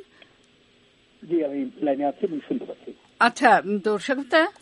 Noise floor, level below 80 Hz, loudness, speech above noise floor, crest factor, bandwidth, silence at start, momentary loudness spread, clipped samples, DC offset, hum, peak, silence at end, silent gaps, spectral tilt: -59 dBFS; -72 dBFS; -23 LUFS; 36 dB; 22 dB; 11.5 kHz; 1.2 s; 13 LU; under 0.1%; under 0.1%; none; -2 dBFS; 0.1 s; none; -4.5 dB/octave